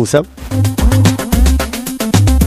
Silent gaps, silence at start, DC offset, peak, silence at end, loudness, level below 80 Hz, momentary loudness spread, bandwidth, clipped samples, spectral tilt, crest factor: none; 0 s; under 0.1%; 0 dBFS; 0 s; -13 LUFS; -16 dBFS; 8 LU; 16 kHz; under 0.1%; -5.5 dB/octave; 12 dB